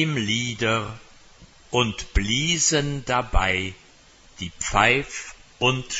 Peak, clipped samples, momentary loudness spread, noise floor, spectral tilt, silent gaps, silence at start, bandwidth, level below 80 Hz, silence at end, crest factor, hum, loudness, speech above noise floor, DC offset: -2 dBFS; under 0.1%; 16 LU; -52 dBFS; -3 dB/octave; none; 0 s; 8.2 kHz; -34 dBFS; 0 s; 22 dB; none; -22 LUFS; 29 dB; under 0.1%